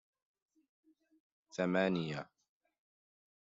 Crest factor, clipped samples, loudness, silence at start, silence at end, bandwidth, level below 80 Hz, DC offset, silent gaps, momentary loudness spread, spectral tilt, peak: 22 dB; under 0.1%; -36 LUFS; 1.55 s; 1.2 s; 7.6 kHz; -80 dBFS; under 0.1%; none; 15 LU; -5 dB/octave; -20 dBFS